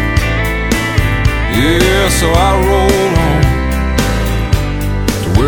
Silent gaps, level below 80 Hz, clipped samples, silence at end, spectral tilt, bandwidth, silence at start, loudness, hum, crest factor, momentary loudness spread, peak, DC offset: none; -16 dBFS; under 0.1%; 0 s; -5 dB/octave; 19.5 kHz; 0 s; -12 LUFS; none; 12 dB; 5 LU; 0 dBFS; under 0.1%